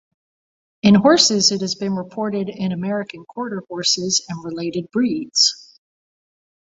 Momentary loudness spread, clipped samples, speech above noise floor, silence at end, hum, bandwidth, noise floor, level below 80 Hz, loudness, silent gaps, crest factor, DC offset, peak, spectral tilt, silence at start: 15 LU; under 0.1%; over 71 dB; 1.05 s; none; 8 kHz; under -90 dBFS; -60 dBFS; -18 LUFS; none; 20 dB; under 0.1%; 0 dBFS; -3.5 dB/octave; 0.85 s